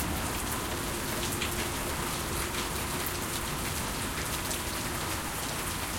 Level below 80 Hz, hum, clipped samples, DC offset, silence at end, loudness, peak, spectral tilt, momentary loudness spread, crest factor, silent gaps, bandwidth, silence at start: -44 dBFS; none; under 0.1%; under 0.1%; 0 s; -32 LUFS; -16 dBFS; -3 dB/octave; 2 LU; 16 dB; none; 17 kHz; 0 s